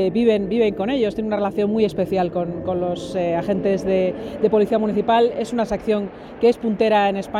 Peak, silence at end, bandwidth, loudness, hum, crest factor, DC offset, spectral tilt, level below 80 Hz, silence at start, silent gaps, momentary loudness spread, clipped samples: -6 dBFS; 0 s; 12 kHz; -20 LUFS; none; 14 dB; under 0.1%; -7 dB/octave; -48 dBFS; 0 s; none; 6 LU; under 0.1%